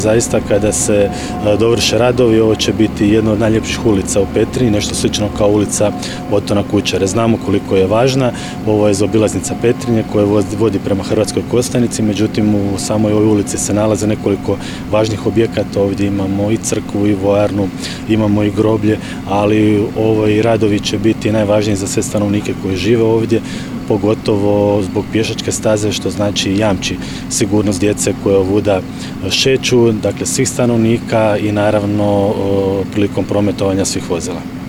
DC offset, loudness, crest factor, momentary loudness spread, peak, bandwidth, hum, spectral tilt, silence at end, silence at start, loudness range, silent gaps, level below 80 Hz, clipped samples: 0.4%; -14 LUFS; 14 dB; 5 LU; 0 dBFS; 18.5 kHz; none; -5 dB/octave; 0 s; 0 s; 2 LU; none; -36 dBFS; under 0.1%